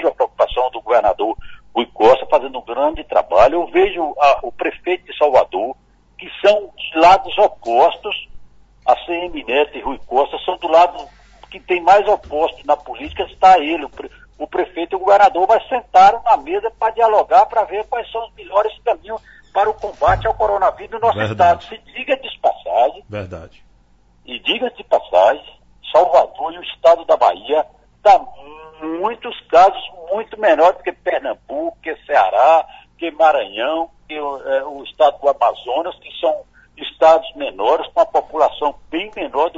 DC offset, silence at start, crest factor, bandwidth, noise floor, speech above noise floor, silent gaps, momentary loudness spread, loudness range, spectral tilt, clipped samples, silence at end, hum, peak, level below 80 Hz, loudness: under 0.1%; 0 s; 16 dB; 7.8 kHz; -52 dBFS; 37 dB; none; 15 LU; 4 LU; -5 dB/octave; under 0.1%; 0 s; none; -2 dBFS; -44 dBFS; -16 LUFS